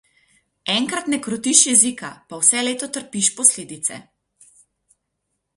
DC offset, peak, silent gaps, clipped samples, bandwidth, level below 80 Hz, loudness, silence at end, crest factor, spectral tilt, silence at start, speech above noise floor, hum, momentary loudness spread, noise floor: under 0.1%; 0 dBFS; none; under 0.1%; 12 kHz; -68 dBFS; -17 LUFS; 1.55 s; 22 dB; -1 dB/octave; 0.65 s; 56 dB; none; 15 LU; -76 dBFS